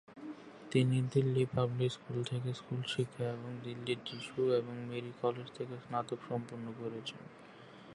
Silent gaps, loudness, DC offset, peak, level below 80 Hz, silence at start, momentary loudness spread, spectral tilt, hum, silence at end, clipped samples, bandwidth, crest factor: none; -37 LUFS; under 0.1%; -16 dBFS; -72 dBFS; 0.1 s; 17 LU; -7 dB/octave; none; 0 s; under 0.1%; 11.5 kHz; 20 dB